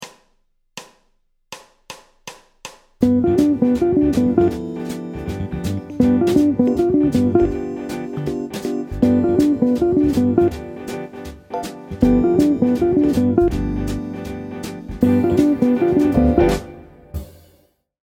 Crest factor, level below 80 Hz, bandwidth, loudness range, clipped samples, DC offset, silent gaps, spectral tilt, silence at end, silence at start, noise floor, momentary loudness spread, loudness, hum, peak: 18 dB; -36 dBFS; 16 kHz; 1 LU; under 0.1%; under 0.1%; none; -7.5 dB/octave; 0.8 s; 0 s; -63 dBFS; 22 LU; -18 LUFS; none; 0 dBFS